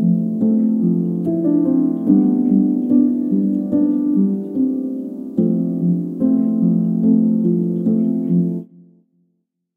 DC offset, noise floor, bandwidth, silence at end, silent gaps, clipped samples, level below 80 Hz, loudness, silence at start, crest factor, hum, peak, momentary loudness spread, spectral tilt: under 0.1%; -70 dBFS; 1.8 kHz; 1.15 s; none; under 0.1%; -64 dBFS; -17 LUFS; 0 s; 14 dB; none; -2 dBFS; 5 LU; -13 dB/octave